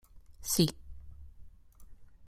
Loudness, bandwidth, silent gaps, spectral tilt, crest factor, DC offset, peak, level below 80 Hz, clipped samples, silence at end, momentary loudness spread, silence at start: -31 LUFS; 16 kHz; none; -4.5 dB/octave; 26 dB; under 0.1%; -12 dBFS; -54 dBFS; under 0.1%; 0 s; 25 LU; 0.15 s